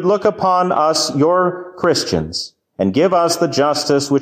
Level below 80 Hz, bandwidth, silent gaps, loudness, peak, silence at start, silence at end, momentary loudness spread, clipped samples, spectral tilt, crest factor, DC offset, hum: -46 dBFS; 16 kHz; none; -16 LUFS; -4 dBFS; 0 s; 0 s; 6 LU; under 0.1%; -4.5 dB/octave; 12 dB; under 0.1%; none